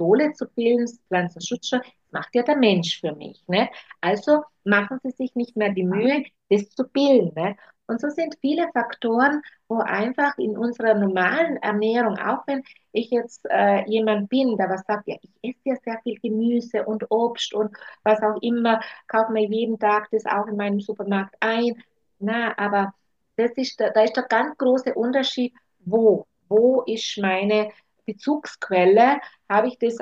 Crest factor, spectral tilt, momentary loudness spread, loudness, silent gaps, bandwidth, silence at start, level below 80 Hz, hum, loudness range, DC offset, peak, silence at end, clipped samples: 18 dB; -5.5 dB/octave; 10 LU; -22 LUFS; none; 7.8 kHz; 0 s; -72 dBFS; none; 3 LU; under 0.1%; -4 dBFS; 0.05 s; under 0.1%